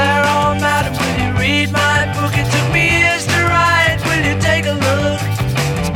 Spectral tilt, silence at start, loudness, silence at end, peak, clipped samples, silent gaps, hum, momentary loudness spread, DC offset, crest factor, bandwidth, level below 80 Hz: -4.5 dB/octave; 0 s; -14 LUFS; 0 s; -2 dBFS; under 0.1%; none; none; 5 LU; under 0.1%; 14 dB; 17.5 kHz; -32 dBFS